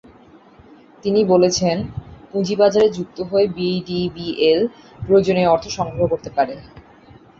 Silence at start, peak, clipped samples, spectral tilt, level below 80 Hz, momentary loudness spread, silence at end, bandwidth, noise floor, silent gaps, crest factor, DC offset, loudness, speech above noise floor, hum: 1.05 s; -2 dBFS; under 0.1%; -5.5 dB/octave; -48 dBFS; 13 LU; 0.6 s; 7.8 kHz; -47 dBFS; none; 16 dB; under 0.1%; -18 LUFS; 29 dB; none